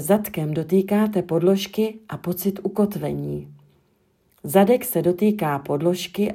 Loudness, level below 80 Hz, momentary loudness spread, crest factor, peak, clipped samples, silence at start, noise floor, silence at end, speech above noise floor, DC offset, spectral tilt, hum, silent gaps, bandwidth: -22 LUFS; -60 dBFS; 10 LU; 20 dB; -2 dBFS; under 0.1%; 0 s; -64 dBFS; 0 s; 43 dB; under 0.1%; -6.5 dB/octave; none; none; 16.5 kHz